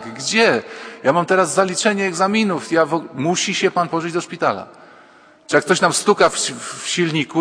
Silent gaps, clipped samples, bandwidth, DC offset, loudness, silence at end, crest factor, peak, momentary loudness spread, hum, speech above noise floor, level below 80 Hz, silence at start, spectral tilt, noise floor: none; under 0.1%; 11 kHz; under 0.1%; -18 LUFS; 0 s; 18 dB; 0 dBFS; 7 LU; none; 30 dB; -64 dBFS; 0 s; -3.5 dB/octave; -48 dBFS